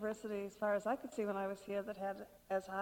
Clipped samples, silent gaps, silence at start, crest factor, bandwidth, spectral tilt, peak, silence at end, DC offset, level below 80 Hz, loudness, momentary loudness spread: under 0.1%; none; 0 s; 16 dB; 18 kHz; -6 dB/octave; -24 dBFS; 0 s; under 0.1%; -74 dBFS; -41 LUFS; 6 LU